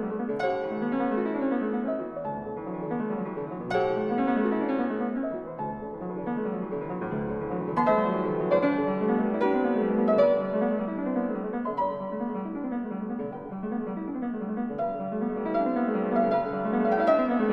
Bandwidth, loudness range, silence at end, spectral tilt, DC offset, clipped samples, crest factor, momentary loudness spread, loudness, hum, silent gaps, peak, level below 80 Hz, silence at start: 6.6 kHz; 6 LU; 0 s; -9 dB/octave; under 0.1%; under 0.1%; 16 dB; 10 LU; -28 LUFS; none; none; -10 dBFS; -58 dBFS; 0 s